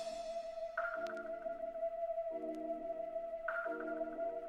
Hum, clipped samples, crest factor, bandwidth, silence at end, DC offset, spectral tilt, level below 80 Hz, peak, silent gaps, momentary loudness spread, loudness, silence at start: none; under 0.1%; 16 dB; 10.5 kHz; 0 s; under 0.1%; -4 dB/octave; -68 dBFS; -26 dBFS; none; 4 LU; -42 LUFS; 0 s